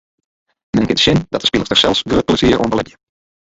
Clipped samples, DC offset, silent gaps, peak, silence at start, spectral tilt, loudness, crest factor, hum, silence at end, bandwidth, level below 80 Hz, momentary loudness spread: under 0.1%; under 0.1%; none; 0 dBFS; 0.75 s; -4.5 dB/octave; -14 LUFS; 16 dB; none; 0.55 s; 8 kHz; -36 dBFS; 7 LU